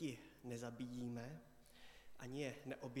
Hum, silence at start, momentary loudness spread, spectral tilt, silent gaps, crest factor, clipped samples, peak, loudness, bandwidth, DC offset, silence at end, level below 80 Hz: none; 0 s; 16 LU; -5.5 dB/octave; none; 18 dB; under 0.1%; -32 dBFS; -50 LUFS; 17.5 kHz; under 0.1%; 0 s; -74 dBFS